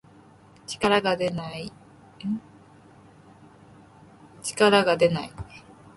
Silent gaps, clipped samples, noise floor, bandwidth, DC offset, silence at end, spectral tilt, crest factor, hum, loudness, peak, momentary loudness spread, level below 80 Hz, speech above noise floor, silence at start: none; under 0.1%; -52 dBFS; 12 kHz; under 0.1%; 0.35 s; -4.5 dB/octave; 20 dB; none; -24 LUFS; -6 dBFS; 21 LU; -56 dBFS; 29 dB; 0.7 s